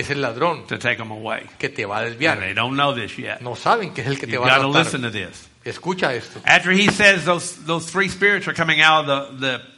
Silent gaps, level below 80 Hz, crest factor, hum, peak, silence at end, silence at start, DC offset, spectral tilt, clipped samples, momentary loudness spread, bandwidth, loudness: none; -56 dBFS; 20 dB; none; 0 dBFS; 0.1 s; 0 s; under 0.1%; -4 dB/octave; under 0.1%; 14 LU; 11.5 kHz; -19 LUFS